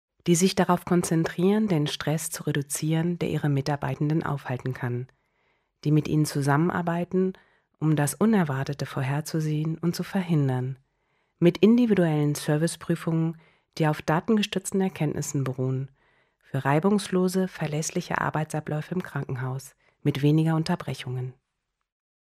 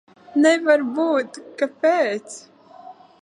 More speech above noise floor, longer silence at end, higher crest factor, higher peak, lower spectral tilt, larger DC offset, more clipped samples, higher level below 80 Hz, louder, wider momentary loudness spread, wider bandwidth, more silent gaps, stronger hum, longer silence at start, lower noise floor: first, 56 dB vs 24 dB; first, 0.9 s vs 0.3 s; about the same, 20 dB vs 16 dB; about the same, -6 dBFS vs -4 dBFS; first, -6 dB/octave vs -3.5 dB/octave; neither; neither; first, -60 dBFS vs -80 dBFS; second, -26 LUFS vs -20 LUFS; second, 9 LU vs 15 LU; first, 15.5 kHz vs 11 kHz; neither; neither; about the same, 0.25 s vs 0.35 s; first, -81 dBFS vs -44 dBFS